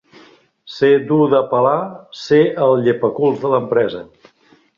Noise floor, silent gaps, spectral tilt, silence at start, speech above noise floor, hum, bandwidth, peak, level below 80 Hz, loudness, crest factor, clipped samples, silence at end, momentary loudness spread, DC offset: -53 dBFS; none; -7.5 dB/octave; 0.65 s; 38 dB; none; 7.2 kHz; -2 dBFS; -60 dBFS; -15 LUFS; 16 dB; under 0.1%; 0.75 s; 12 LU; under 0.1%